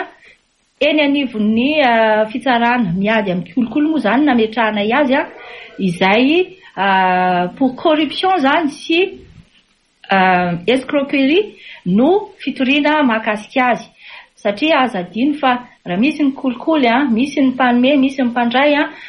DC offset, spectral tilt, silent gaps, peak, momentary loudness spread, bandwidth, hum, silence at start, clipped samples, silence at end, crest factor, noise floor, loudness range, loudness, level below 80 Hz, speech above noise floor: under 0.1%; -6 dB/octave; none; -2 dBFS; 8 LU; 11 kHz; none; 0 s; under 0.1%; 0 s; 14 dB; -56 dBFS; 2 LU; -15 LUFS; -54 dBFS; 41 dB